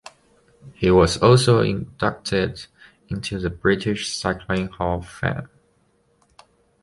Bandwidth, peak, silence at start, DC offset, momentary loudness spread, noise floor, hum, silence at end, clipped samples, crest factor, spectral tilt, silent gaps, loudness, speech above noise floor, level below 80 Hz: 11.5 kHz; -2 dBFS; 0.65 s; under 0.1%; 13 LU; -63 dBFS; none; 1.35 s; under 0.1%; 20 dB; -5.5 dB/octave; none; -21 LUFS; 43 dB; -40 dBFS